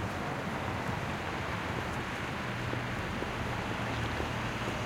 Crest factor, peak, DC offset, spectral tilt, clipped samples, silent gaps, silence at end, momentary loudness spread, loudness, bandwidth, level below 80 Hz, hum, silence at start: 16 dB; -18 dBFS; under 0.1%; -5.5 dB/octave; under 0.1%; none; 0 s; 2 LU; -35 LUFS; 16.5 kHz; -50 dBFS; none; 0 s